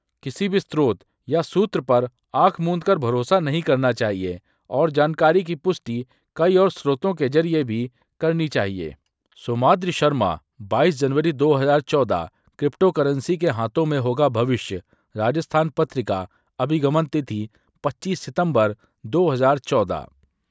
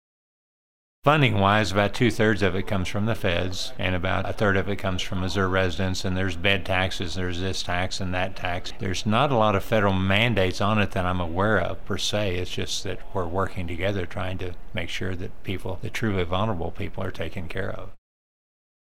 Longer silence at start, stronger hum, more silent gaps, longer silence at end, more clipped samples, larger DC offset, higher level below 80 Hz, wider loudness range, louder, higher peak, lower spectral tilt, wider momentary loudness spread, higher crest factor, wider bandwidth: second, 0.25 s vs 1 s; neither; neither; second, 0.45 s vs 1 s; neither; second, under 0.1% vs 3%; second, -54 dBFS vs -40 dBFS; second, 3 LU vs 7 LU; first, -21 LUFS vs -25 LUFS; first, -2 dBFS vs -6 dBFS; first, -7 dB/octave vs -5.5 dB/octave; about the same, 12 LU vs 11 LU; about the same, 18 dB vs 20 dB; second, 8 kHz vs 16 kHz